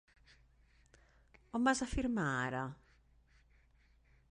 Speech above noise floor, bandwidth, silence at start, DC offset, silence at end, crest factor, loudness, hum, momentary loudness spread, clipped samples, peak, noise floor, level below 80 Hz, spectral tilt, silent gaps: 33 dB; 11 kHz; 1.55 s; under 0.1%; 1.55 s; 22 dB; -36 LUFS; none; 10 LU; under 0.1%; -18 dBFS; -69 dBFS; -56 dBFS; -5 dB/octave; none